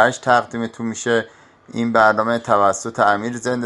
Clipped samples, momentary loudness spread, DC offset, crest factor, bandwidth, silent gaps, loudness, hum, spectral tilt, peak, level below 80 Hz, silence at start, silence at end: under 0.1%; 11 LU; under 0.1%; 18 dB; 11.5 kHz; none; -18 LUFS; none; -4.5 dB/octave; 0 dBFS; -60 dBFS; 0 s; 0 s